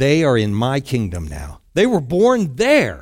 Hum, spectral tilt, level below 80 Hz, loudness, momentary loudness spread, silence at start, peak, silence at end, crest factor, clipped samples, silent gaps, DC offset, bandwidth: none; -6 dB/octave; -40 dBFS; -17 LUFS; 12 LU; 0 s; -2 dBFS; 0 s; 16 dB; under 0.1%; none; under 0.1%; 16.5 kHz